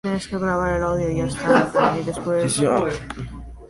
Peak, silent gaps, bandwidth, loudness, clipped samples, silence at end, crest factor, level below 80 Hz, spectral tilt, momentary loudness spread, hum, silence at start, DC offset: -2 dBFS; none; 11.5 kHz; -21 LUFS; under 0.1%; 0.05 s; 18 dB; -40 dBFS; -5.5 dB/octave; 12 LU; none; 0.05 s; under 0.1%